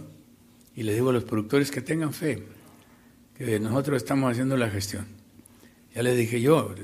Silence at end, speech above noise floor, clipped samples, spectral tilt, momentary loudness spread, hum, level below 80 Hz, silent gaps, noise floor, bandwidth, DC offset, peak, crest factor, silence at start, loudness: 0 s; 30 dB; under 0.1%; -6 dB/octave; 13 LU; none; -62 dBFS; none; -55 dBFS; 15.5 kHz; under 0.1%; -8 dBFS; 20 dB; 0 s; -26 LUFS